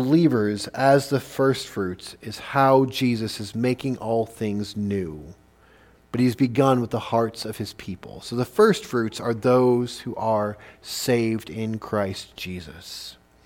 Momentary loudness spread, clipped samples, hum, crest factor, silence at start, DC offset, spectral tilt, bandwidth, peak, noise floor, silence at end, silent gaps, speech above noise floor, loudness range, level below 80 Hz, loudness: 17 LU; under 0.1%; none; 18 dB; 0 s; under 0.1%; -6 dB/octave; 17.5 kHz; -4 dBFS; -54 dBFS; 0.35 s; none; 31 dB; 5 LU; -56 dBFS; -23 LUFS